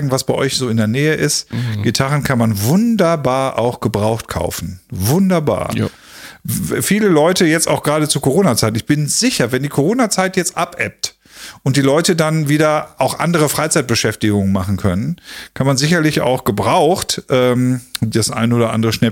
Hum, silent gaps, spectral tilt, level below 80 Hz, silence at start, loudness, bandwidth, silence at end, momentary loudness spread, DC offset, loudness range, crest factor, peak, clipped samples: none; none; -5 dB/octave; -44 dBFS; 0 s; -15 LUFS; 17 kHz; 0 s; 8 LU; under 0.1%; 2 LU; 14 dB; -2 dBFS; under 0.1%